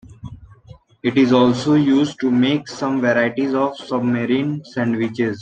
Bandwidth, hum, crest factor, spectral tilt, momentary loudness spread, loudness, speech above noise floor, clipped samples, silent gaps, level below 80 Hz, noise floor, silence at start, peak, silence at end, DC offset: 8.8 kHz; none; 16 dB; -6.5 dB/octave; 8 LU; -18 LUFS; 27 dB; under 0.1%; none; -54 dBFS; -45 dBFS; 0.1 s; -2 dBFS; 0 s; under 0.1%